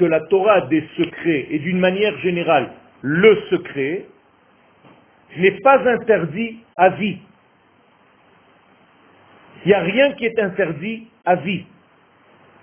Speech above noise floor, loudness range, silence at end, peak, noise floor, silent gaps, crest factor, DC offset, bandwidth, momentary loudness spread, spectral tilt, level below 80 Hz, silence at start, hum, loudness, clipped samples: 38 dB; 5 LU; 1 s; 0 dBFS; -55 dBFS; none; 18 dB; under 0.1%; 3.5 kHz; 13 LU; -10 dB/octave; -58 dBFS; 0 s; none; -18 LUFS; under 0.1%